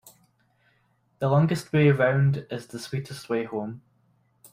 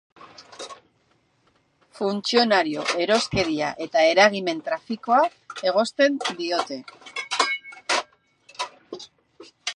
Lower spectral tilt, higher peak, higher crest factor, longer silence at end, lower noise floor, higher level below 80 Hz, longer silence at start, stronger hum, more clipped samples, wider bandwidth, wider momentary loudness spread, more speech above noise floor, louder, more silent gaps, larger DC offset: first, -7.5 dB/octave vs -3 dB/octave; second, -8 dBFS vs -2 dBFS; about the same, 20 dB vs 24 dB; first, 0.75 s vs 0 s; about the same, -67 dBFS vs -65 dBFS; about the same, -62 dBFS vs -60 dBFS; first, 1.2 s vs 0.2 s; neither; neither; first, 15 kHz vs 11.5 kHz; second, 15 LU vs 20 LU; about the same, 43 dB vs 43 dB; about the same, -25 LUFS vs -23 LUFS; neither; neither